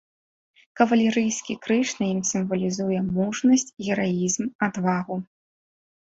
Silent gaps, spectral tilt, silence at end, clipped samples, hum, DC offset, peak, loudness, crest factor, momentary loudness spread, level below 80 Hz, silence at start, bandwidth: 4.55-4.59 s; -5 dB/octave; 0.8 s; under 0.1%; none; under 0.1%; -4 dBFS; -24 LUFS; 20 dB; 7 LU; -62 dBFS; 0.75 s; 8 kHz